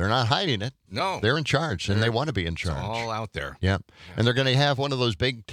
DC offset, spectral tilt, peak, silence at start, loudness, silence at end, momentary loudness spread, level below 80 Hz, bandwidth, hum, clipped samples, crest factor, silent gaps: under 0.1%; -5.5 dB/octave; -4 dBFS; 0 s; -25 LUFS; 0 s; 9 LU; -48 dBFS; 14 kHz; none; under 0.1%; 20 dB; none